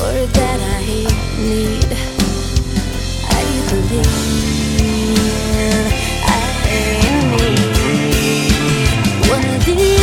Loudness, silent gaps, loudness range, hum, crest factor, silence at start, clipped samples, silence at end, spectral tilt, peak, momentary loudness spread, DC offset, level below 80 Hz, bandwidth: -15 LUFS; none; 3 LU; none; 14 dB; 0 s; under 0.1%; 0 s; -4.5 dB/octave; 0 dBFS; 4 LU; under 0.1%; -20 dBFS; 17.5 kHz